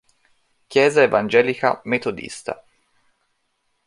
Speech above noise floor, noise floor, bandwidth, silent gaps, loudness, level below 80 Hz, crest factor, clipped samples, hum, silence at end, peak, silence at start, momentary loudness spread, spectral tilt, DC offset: 51 dB; -70 dBFS; 11.5 kHz; none; -19 LUFS; -62 dBFS; 20 dB; under 0.1%; none; 1.3 s; -2 dBFS; 0.7 s; 16 LU; -4.5 dB/octave; under 0.1%